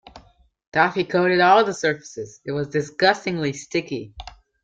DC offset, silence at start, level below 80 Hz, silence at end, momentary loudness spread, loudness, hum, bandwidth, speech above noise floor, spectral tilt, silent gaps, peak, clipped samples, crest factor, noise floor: under 0.1%; 0.15 s; -54 dBFS; 0.35 s; 17 LU; -21 LUFS; none; 9 kHz; 34 dB; -5 dB/octave; 0.67-0.72 s; -4 dBFS; under 0.1%; 18 dB; -55 dBFS